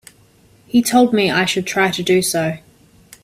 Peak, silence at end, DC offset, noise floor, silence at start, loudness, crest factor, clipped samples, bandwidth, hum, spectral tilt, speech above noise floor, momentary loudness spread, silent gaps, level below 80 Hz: 0 dBFS; 0.65 s; under 0.1%; -51 dBFS; 0.75 s; -16 LUFS; 16 dB; under 0.1%; 16 kHz; none; -4 dB/octave; 35 dB; 7 LU; none; -54 dBFS